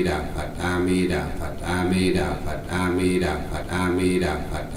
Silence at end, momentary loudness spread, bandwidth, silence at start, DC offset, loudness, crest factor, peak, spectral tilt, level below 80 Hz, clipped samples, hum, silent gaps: 0 s; 8 LU; 16 kHz; 0 s; under 0.1%; -24 LUFS; 14 dB; -8 dBFS; -6 dB/octave; -36 dBFS; under 0.1%; none; none